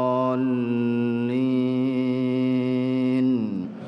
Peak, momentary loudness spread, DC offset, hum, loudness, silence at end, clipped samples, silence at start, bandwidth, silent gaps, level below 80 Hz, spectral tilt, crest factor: -12 dBFS; 2 LU; under 0.1%; none; -23 LUFS; 0 s; under 0.1%; 0 s; 5.6 kHz; none; -70 dBFS; -9 dB/octave; 12 dB